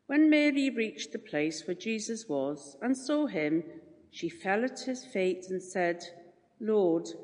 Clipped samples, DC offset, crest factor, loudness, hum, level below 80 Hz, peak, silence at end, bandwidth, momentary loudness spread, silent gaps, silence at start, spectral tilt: under 0.1%; under 0.1%; 18 dB; -31 LUFS; none; -82 dBFS; -14 dBFS; 0 s; 10 kHz; 13 LU; none; 0.1 s; -4.5 dB/octave